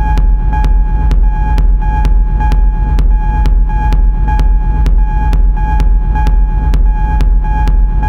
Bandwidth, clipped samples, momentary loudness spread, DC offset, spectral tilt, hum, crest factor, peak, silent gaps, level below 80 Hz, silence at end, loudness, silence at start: 4.6 kHz; under 0.1%; 1 LU; under 0.1%; -8 dB/octave; none; 8 dB; 0 dBFS; none; -8 dBFS; 0 s; -13 LUFS; 0 s